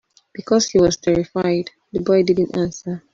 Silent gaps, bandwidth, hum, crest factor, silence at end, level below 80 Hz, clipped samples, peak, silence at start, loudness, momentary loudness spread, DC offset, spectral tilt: none; 7.6 kHz; none; 16 dB; 0.15 s; -48 dBFS; under 0.1%; -4 dBFS; 0.4 s; -19 LUFS; 12 LU; under 0.1%; -5.5 dB/octave